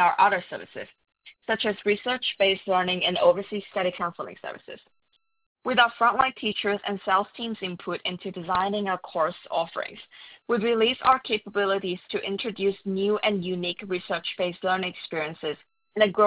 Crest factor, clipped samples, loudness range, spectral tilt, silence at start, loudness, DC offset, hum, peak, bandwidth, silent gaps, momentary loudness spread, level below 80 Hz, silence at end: 22 dB; under 0.1%; 3 LU; -8 dB/octave; 0 s; -26 LUFS; under 0.1%; none; -4 dBFS; 4 kHz; 5.46-5.55 s; 15 LU; -64 dBFS; 0 s